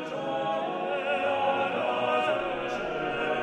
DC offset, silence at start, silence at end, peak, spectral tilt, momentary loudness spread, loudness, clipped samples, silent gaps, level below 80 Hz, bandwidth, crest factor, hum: under 0.1%; 0 s; 0 s; -16 dBFS; -5 dB/octave; 5 LU; -28 LUFS; under 0.1%; none; -60 dBFS; 10 kHz; 14 dB; none